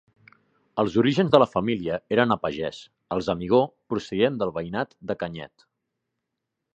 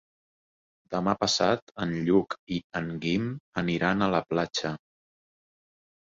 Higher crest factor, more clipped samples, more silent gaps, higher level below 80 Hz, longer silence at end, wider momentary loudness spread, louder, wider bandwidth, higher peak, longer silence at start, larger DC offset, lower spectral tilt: about the same, 24 dB vs 20 dB; neither; second, none vs 1.62-1.67 s, 2.39-2.47 s, 2.64-2.70 s, 3.40-3.52 s; about the same, -56 dBFS vs -58 dBFS; about the same, 1.3 s vs 1.35 s; first, 14 LU vs 9 LU; first, -24 LUFS vs -28 LUFS; first, 8.6 kHz vs 7.8 kHz; first, 0 dBFS vs -8 dBFS; second, 0.75 s vs 0.9 s; neither; first, -7 dB/octave vs -5 dB/octave